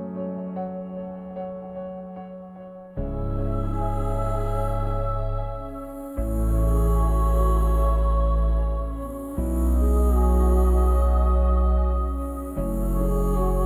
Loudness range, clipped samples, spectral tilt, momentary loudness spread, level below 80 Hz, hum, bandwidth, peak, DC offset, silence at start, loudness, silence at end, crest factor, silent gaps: 9 LU; under 0.1%; -9 dB/octave; 14 LU; -24 dBFS; none; 13.5 kHz; -10 dBFS; under 0.1%; 0 s; -25 LUFS; 0 s; 12 dB; none